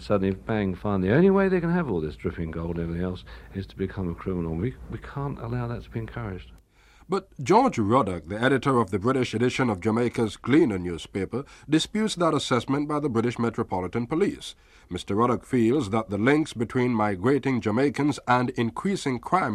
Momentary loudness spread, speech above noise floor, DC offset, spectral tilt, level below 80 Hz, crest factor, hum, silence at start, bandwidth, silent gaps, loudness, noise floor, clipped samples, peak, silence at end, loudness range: 11 LU; 29 dB; under 0.1%; -6.5 dB/octave; -48 dBFS; 18 dB; none; 0 s; 13 kHz; none; -25 LUFS; -54 dBFS; under 0.1%; -8 dBFS; 0 s; 8 LU